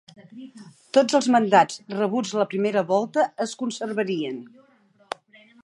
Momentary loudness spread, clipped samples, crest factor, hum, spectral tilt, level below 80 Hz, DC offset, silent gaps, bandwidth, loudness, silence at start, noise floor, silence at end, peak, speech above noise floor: 19 LU; under 0.1%; 20 dB; none; -4.5 dB/octave; -78 dBFS; under 0.1%; none; 11.5 kHz; -23 LUFS; 0.35 s; -59 dBFS; 1.15 s; -2 dBFS; 36 dB